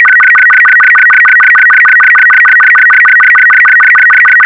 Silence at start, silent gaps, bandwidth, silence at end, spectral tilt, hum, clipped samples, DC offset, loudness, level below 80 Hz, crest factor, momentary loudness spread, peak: 0 s; none; 6 kHz; 0 s; -1 dB/octave; none; 0.5%; under 0.1%; -1 LUFS; -56 dBFS; 4 dB; 0 LU; 0 dBFS